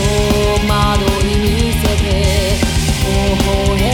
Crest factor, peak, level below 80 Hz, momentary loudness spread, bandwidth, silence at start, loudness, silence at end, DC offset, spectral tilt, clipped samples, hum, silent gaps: 12 dB; -2 dBFS; -18 dBFS; 1 LU; 19 kHz; 0 s; -14 LUFS; 0 s; under 0.1%; -5 dB/octave; under 0.1%; none; none